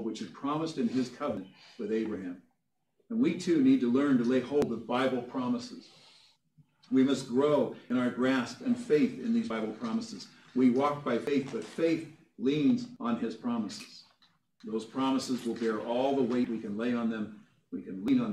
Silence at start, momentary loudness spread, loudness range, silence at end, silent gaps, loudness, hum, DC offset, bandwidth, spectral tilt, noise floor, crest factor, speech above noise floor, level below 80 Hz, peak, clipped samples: 0 s; 14 LU; 4 LU; 0 s; none; -31 LUFS; none; under 0.1%; 10.5 kHz; -6 dB/octave; -80 dBFS; 16 dB; 50 dB; -74 dBFS; -14 dBFS; under 0.1%